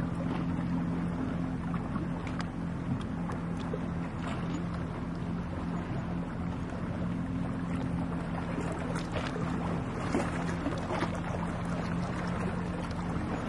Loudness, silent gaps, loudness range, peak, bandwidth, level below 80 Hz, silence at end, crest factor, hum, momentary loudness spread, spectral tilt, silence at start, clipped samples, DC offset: -34 LUFS; none; 2 LU; -16 dBFS; 11.5 kHz; -46 dBFS; 0 s; 18 dB; none; 3 LU; -7.5 dB/octave; 0 s; under 0.1%; under 0.1%